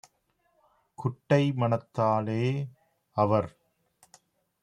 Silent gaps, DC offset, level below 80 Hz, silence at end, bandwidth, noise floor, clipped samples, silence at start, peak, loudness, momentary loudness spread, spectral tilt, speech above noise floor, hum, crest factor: none; under 0.1%; -68 dBFS; 1.15 s; 10.5 kHz; -73 dBFS; under 0.1%; 1 s; -10 dBFS; -28 LUFS; 10 LU; -8 dB/octave; 46 dB; none; 20 dB